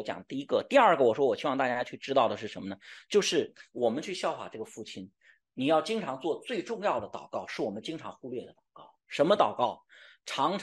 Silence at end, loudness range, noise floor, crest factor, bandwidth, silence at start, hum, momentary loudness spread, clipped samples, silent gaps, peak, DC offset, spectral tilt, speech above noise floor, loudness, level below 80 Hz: 0 s; 6 LU; -56 dBFS; 20 dB; 12.5 kHz; 0 s; none; 16 LU; under 0.1%; none; -10 dBFS; under 0.1%; -4 dB/octave; 27 dB; -29 LUFS; -76 dBFS